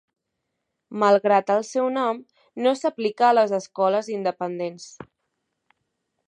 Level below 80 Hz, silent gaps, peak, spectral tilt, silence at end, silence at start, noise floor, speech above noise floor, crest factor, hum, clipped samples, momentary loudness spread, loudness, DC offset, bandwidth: -76 dBFS; none; -6 dBFS; -5 dB/octave; 1.25 s; 0.9 s; -79 dBFS; 58 dB; 18 dB; none; under 0.1%; 15 LU; -22 LUFS; under 0.1%; 9.8 kHz